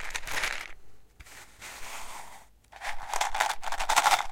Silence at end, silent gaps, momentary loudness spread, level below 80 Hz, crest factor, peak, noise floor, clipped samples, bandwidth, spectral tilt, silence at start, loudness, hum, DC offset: 0 s; none; 23 LU; -46 dBFS; 24 dB; -6 dBFS; -51 dBFS; under 0.1%; 17 kHz; 0.5 dB/octave; 0 s; -30 LUFS; none; under 0.1%